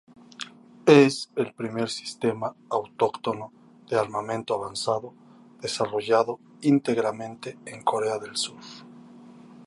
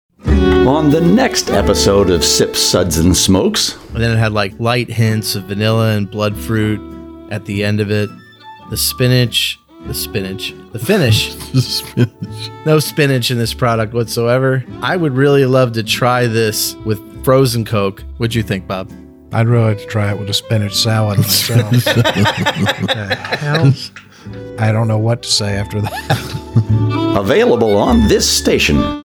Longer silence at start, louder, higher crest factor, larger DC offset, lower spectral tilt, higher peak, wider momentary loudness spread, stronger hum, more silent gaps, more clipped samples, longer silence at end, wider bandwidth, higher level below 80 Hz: first, 0.4 s vs 0.25 s; second, -26 LUFS vs -14 LUFS; first, 24 dB vs 14 dB; neither; about the same, -5 dB/octave vs -5 dB/octave; about the same, -2 dBFS vs -2 dBFS; first, 17 LU vs 10 LU; neither; neither; neither; about the same, 0 s vs 0.05 s; second, 11.5 kHz vs 19.5 kHz; second, -70 dBFS vs -30 dBFS